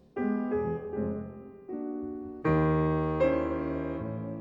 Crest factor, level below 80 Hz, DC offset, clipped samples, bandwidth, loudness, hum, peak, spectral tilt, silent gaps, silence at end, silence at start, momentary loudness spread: 14 dB; -48 dBFS; under 0.1%; under 0.1%; 5.2 kHz; -30 LUFS; none; -16 dBFS; -10.5 dB/octave; none; 0 s; 0.15 s; 12 LU